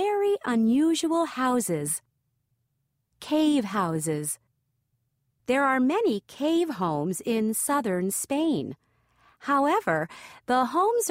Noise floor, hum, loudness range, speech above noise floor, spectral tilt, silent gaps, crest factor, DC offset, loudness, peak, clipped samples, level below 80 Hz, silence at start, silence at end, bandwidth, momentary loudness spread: -77 dBFS; none; 3 LU; 51 dB; -4.5 dB/octave; none; 16 dB; under 0.1%; -26 LUFS; -10 dBFS; under 0.1%; -68 dBFS; 0 s; 0 s; 16 kHz; 9 LU